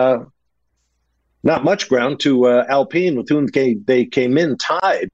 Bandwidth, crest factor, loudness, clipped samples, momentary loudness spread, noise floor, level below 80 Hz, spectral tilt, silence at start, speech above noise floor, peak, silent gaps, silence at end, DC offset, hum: 8 kHz; 12 dB; -17 LUFS; under 0.1%; 4 LU; -70 dBFS; -60 dBFS; -5.5 dB/octave; 0 s; 54 dB; -4 dBFS; none; 0.05 s; under 0.1%; none